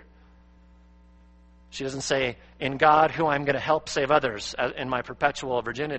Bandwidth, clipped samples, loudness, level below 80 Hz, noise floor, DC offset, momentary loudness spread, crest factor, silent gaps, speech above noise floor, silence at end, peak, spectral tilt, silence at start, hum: 8.4 kHz; under 0.1%; -25 LUFS; -54 dBFS; -54 dBFS; under 0.1%; 12 LU; 22 dB; none; 29 dB; 0 s; -4 dBFS; -4 dB/octave; 1.7 s; none